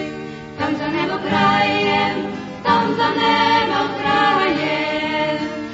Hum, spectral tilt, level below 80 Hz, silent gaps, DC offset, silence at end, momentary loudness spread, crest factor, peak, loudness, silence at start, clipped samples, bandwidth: none; -5 dB/octave; -52 dBFS; none; under 0.1%; 0 s; 10 LU; 16 dB; -4 dBFS; -18 LUFS; 0 s; under 0.1%; 8 kHz